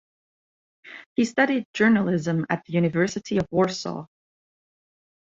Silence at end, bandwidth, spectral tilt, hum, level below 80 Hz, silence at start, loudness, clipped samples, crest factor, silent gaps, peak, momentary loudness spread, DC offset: 1.2 s; 7.8 kHz; -6 dB/octave; none; -60 dBFS; 0.85 s; -23 LUFS; under 0.1%; 20 dB; 1.06-1.16 s, 1.65-1.74 s; -6 dBFS; 13 LU; under 0.1%